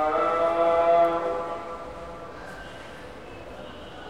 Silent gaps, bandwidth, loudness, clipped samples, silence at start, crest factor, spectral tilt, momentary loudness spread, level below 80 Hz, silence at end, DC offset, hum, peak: none; 11 kHz; -23 LUFS; under 0.1%; 0 s; 16 dB; -5.5 dB/octave; 21 LU; -52 dBFS; 0 s; 0.3%; none; -10 dBFS